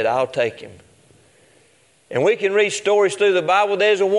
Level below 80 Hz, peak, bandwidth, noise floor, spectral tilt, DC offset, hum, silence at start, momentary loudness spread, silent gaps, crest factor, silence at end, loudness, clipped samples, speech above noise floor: -70 dBFS; -4 dBFS; 11.5 kHz; -56 dBFS; -3.5 dB/octave; under 0.1%; none; 0 s; 8 LU; none; 16 dB; 0 s; -18 LUFS; under 0.1%; 39 dB